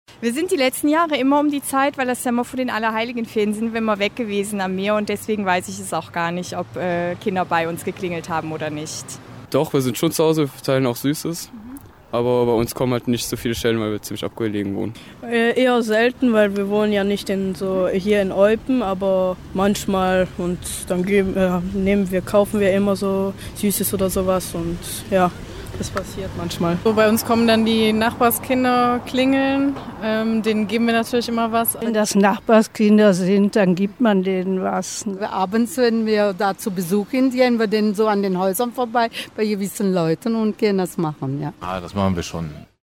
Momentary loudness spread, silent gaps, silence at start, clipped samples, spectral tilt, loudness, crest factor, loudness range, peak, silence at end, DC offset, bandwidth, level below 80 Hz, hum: 10 LU; none; 0.1 s; under 0.1%; -5 dB/octave; -20 LUFS; 16 dB; 5 LU; -4 dBFS; 0.2 s; under 0.1%; 17 kHz; -46 dBFS; none